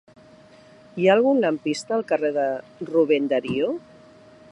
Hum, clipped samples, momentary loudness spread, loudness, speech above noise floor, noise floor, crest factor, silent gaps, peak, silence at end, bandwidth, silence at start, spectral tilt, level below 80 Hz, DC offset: none; under 0.1%; 9 LU; -22 LUFS; 28 dB; -50 dBFS; 20 dB; none; -4 dBFS; 0.7 s; 11 kHz; 0.95 s; -5.5 dB/octave; -68 dBFS; under 0.1%